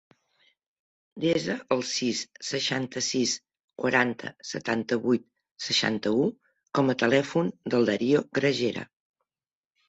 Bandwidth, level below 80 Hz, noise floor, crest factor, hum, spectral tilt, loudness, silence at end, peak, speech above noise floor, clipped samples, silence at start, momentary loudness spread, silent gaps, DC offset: 8.2 kHz; -68 dBFS; under -90 dBFS; 22 dB; none; -4 dB/octave; -27 LUFS; 1.05 s; -6 dBFS; over 64 dB; under 0.1%; 1.15 s; 8 LU; 3.60-3.68 s, 5.51-5.55 s; under 0.1%